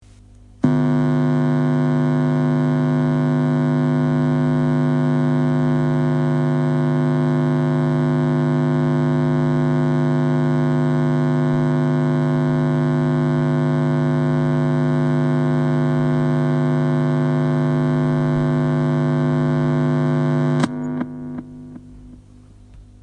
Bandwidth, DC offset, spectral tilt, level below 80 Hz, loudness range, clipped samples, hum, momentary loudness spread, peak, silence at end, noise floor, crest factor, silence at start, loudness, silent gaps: 8.4 kHz; under 0.1%; -9 dB/octave; -48 dBFS; 1 LU; under 0.1%; 50 Hz at -20 dBFS; 1 LU; -4 dBFS; 0.2 s; -45 dBFS; 14 dB; 0.65 s; -19 LUFS; none